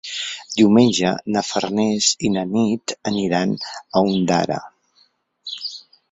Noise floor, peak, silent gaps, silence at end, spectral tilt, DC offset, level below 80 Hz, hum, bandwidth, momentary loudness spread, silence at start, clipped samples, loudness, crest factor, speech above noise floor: -60 dBFS; -2 dBFS; none; 0.3 s; -4.5 dB/octave; under 0.1%; -58 dBFS; none; 8.2 kHz; 14 LU; 0.05 s; under 0.1%; -19 LUFS; 18 dB; 41 dB